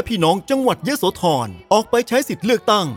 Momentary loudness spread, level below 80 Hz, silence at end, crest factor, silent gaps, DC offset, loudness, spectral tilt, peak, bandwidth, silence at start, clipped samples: 3 LU; -50 dBFS; 0 s; 16 dB; none; under 0.1%; -18 LUFS; -4.5 dB/octave; -2 dBFS; 18.5 kHz; 0 s; under 0.1%